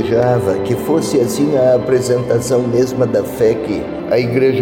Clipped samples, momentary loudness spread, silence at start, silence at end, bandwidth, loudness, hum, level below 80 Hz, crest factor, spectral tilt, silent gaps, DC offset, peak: under 0.1%; 4 LU; 0 s; 0 s; 17 kHz; -15 LUFS; none; -44 dBFS; 12 dB; -6.5 dB/octave; none; under 0.1%; -4 dBFS